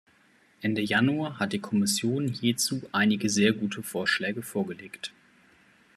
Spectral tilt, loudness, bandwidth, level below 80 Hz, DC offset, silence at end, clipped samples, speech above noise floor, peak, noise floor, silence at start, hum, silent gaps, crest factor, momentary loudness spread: -4 dB/octave; -27 LUFS; 14 kHz; -70 dBFS; under 0.1%; 0.85 s; under 0.1%; 35 dB; -8 dBFS; -62 dBFS; 0.6 s; none; none; 20 dB; 10 LU